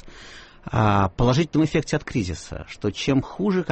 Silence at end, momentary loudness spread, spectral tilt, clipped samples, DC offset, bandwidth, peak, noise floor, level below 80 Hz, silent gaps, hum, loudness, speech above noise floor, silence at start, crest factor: 0 s; 19 LU; -6.5 dB/octave; under 0.1%; under 0.1%; 8.4 kHz; -8 dBFS; -43 dBFS; -40 dBFS; none; none; -23 LUFS; 21 dB; 0.05 s; 14 dB